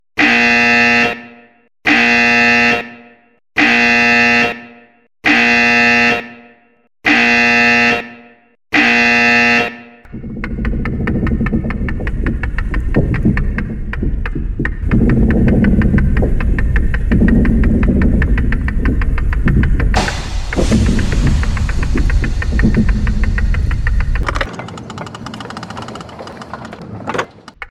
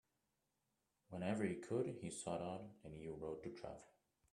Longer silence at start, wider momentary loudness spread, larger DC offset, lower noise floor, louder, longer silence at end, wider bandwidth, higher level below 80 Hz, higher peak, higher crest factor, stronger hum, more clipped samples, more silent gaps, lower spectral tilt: second, 0.15 s vs 1.1 s; first, 19 LU vs 13 LU; neither; second, -45 dBFS vs -88 dBFS; first, -13 LUFS vs -47 LUFS; second, 0.05 s vs 0.45 s; about the same, 11 kHz vs 12 kHz; first, -18 dBFS vs -76 dBFS; first, 0 dBFS vs -26 dBFS; second, 12 dB vs 22 dB; neither; neither; neither; about the same, -5.5 dB/octave vs -6 dB/octave